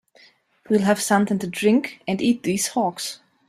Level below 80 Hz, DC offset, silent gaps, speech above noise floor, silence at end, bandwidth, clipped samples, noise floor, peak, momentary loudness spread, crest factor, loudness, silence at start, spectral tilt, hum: -62 dBFS; under 0.1%; none; 34 dB; 0.35 s; 15 kHz; under 0.1%; -55 dBFS; -4 dBFS; 7 LU; 18 dB; -22 LUFS; 0.7 s; -4.5 dB/octave; none